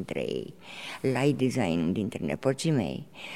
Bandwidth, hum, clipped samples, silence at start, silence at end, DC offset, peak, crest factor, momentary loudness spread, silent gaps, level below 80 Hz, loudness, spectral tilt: 15.5 kHz; none; under 0.1%; 0 s; 0 s; 0.2%; -12 dBFS; 18 dB; 13 LU; none; -58 dBFS; -29 LUFS; -6 dB/octave